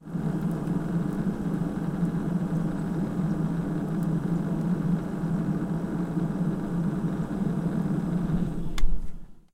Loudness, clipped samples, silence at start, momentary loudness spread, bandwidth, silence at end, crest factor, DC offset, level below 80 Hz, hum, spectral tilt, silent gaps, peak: -29 LUFS; under 0.1%; 0 s; 2 LU; 12.5 kHz; 0.15 s; 18 dB; under 0.1%; -36 dBFS; none; -9 dB/octave; none; -10 dBFS